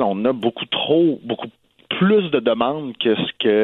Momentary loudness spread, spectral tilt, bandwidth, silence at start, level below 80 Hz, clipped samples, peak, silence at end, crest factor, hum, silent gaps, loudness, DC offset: 11 LU; -8.5 dB/octave; 4.2 kHz; 0 s; -64 dBFS; under 0.1%; -4 dBFS; 0 s; 16 dB; none; none; -19 LUFS; under 0.1%